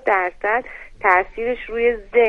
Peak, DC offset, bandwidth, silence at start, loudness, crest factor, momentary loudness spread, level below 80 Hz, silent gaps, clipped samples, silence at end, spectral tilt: 0 dBFS; under 0.1%; 5.4 kHz; 0.05 s; -20 LUFS; 20 dB; 8 LU; -44 dBFS; none; under 0.1%; 0 s; -5.5 dB/octave